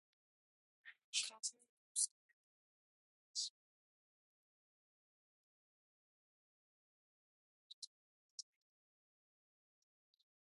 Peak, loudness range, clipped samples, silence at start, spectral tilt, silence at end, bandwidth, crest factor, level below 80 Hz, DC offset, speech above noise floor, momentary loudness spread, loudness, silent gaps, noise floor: -24 dBFS; 16 LU; under 0.1%; 0.85 s; 5.5 dB/octave; 2.15 s; 11 kHz; 30 dB; under -90 dBFS; under 0.1%; over 45 dB; 23 LU; -43 LUFS; 1.04-1.13 s, 1.69-1.95 s, 2.11-3.34 s, 3.50-8.38 s; under -90 dBFS